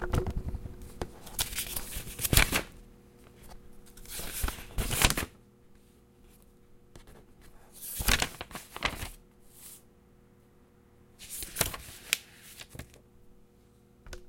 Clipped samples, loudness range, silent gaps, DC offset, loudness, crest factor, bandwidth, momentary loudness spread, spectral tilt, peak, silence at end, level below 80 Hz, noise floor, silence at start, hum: under 0.1%; 6 LU; none; under 0.1%; -32 LUFS; 32 dB; 17 kHz; 25 LU; -2.5 dB/octave; -4 dBFS; 0 s; -42 dBFS; -60 dBFS; 0 s; none